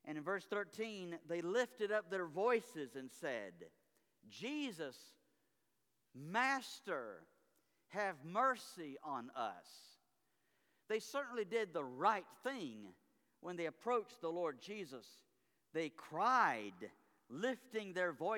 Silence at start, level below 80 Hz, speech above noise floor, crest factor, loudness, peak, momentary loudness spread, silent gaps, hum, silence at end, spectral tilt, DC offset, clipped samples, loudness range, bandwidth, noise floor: 0.05 s; under -90 dBFS; 44 dB; 22 dB; -42 LUFS; -22 dBFS; 17 LU; none; none; 0 s; -4 dB/octave; under 0.1%; under 0.1%; 5 LU; 19 kHz; -85 dBFS